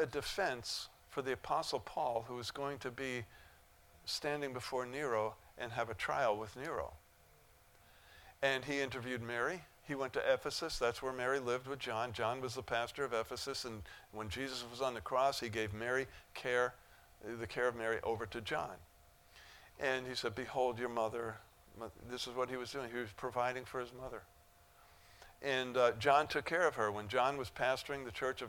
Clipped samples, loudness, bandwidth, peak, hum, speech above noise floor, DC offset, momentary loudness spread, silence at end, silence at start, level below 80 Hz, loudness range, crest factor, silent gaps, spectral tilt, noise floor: under 0.1%; -39 LUFS; 19 kHz; -14 dBFS; none; 27 dB; under 0.1%; 12 LU; 0 s; 0 s; -64 dBFS; 5 LU; 24 dB; none; -4 dB/octave; -66 dBFS